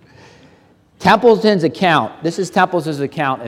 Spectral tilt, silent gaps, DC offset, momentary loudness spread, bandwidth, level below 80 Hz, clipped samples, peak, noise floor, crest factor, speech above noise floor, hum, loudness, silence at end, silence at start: -5.5 dB/octave; none; under 0.1%; 10 LU; 14 kHz; -56 dBFS; under 0.1%; 0 dBFS; -51 dBFS; 16 dB; 36 dB; none; -15 LUFS; 0 s; 1 s